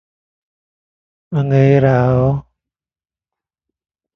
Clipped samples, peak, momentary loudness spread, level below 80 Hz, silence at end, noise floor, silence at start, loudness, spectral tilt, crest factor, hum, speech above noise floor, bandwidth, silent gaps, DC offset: under 0.1%; 0 dBFS; 11 LU; -44 dBFS; 1.75 s; under -90 dBFS; 1.3 s; -14 LUFS; -10 dB/octave; 18 dB; none; over 78 dB; 6.2 kHz; none; under 0.1%